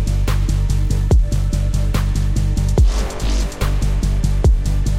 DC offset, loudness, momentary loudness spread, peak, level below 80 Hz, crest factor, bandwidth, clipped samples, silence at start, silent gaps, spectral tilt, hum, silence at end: under 0.1%; -19 LUFS; 4 LU; -4 dBFS; -16 dBFS; 12 dB; 15 kHz; under 0.1%; 0 s; none; -6 dB/octave; none; 0 s